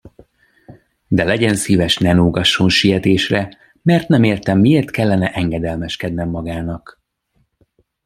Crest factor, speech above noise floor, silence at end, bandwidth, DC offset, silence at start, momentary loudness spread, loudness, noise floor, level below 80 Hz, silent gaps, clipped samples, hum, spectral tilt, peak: 16 dB; 49 dB; 1.3 s; 15 kHz; under 0.1%; 0.05 s; 10 LU; -15 LUFS; -64 dBFS; -42 dBFS; none; under 0.1%; none; -5.5 dB/octave; -2 dBFS